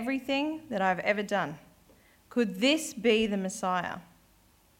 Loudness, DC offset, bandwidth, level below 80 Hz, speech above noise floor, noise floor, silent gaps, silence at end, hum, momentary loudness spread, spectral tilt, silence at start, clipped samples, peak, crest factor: -29 LUFS; under 0.1%; 17 kHz; -64 dBFS; 34 dB; -63 dBFS; none; 0.75 s; none; 10 LU; -4 dB/octave; 0 s; under 0.1%; -12 dBFS; 18 dB